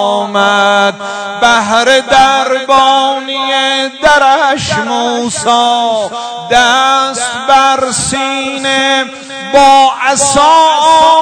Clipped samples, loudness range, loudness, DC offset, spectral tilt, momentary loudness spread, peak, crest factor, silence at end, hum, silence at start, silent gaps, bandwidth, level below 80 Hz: 2%; 2 LU; -9 LUFS; under 0.1%; -2 dB/octave; 8 LU; 0 dBFS; 10 dB; 0 s; none; 0 s; none; 11 kHz; -42 dBFS